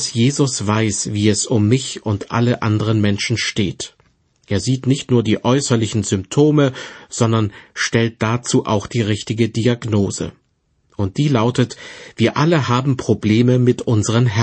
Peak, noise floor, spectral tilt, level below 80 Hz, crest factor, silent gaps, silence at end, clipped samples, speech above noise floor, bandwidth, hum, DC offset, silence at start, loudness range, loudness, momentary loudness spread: -2 dBFS; -64 dBFS; -5.5 dB/octave; -50 dBFS; 16 dB; none; 0 s; under 0.1%; 47 dB; 8.8 kHz; none; under 0.1%; 0 s; 3 LU; -17 LUFS; 8 LU